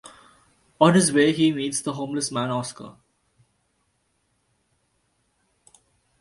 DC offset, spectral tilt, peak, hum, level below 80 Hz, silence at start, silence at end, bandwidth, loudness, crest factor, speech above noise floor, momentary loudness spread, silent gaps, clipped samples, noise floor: under 0.1%; -4.5 dB/octave; -2 dBFS; none; -64 dBFS; 0.8 s; 3.3 s; 11.5 kHz; -22 LUFS; 24 dB; 49 dB; 16 LU; none; under 0.1%; -71 dBFS